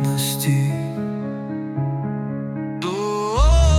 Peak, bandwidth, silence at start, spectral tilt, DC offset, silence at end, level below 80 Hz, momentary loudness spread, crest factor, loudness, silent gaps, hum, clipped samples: -6 dBFS; 18 kHz; 0 s; -6 dB/octave; under 0.1%; 0 s; -24 dBFS; 9 LU; 14 dB; -23 LUFS; none; none; under 0.1%